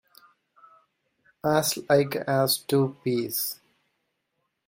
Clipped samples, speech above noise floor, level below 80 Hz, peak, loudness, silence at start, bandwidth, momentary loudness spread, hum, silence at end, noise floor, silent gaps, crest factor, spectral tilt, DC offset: under 0.1%; 53 dB; -68 dBFS; -8 dBFS; -25 LUFS; 1.45 s; 16.5 kHz; 7 LU; none; 1.15 s; -78 dBFS; none; 20 dB; -4.5 dB/octave; under 0.1%